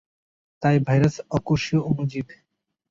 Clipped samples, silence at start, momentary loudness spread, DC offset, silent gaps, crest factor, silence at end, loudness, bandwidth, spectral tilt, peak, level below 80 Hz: under 0.1%; 0.6 s; 10 LU; under 0.1%; none; 16 dB; 0.65 s; -23 LUFS; 7.6 kHz; -7 dB/octave; -8 dBFS; -50 dBFS